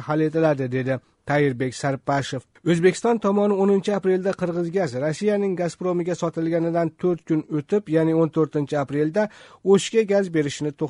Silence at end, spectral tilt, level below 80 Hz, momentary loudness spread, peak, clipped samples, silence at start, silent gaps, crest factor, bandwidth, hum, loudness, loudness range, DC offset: 0 s; -6.5 dB/octave; -62 dBFS; 6 LU; -6 dBFS; under 0.1%; 0 s; none; 16 dB; 11 kHz; none; -22 LUFS; 2 LU; under 0.1%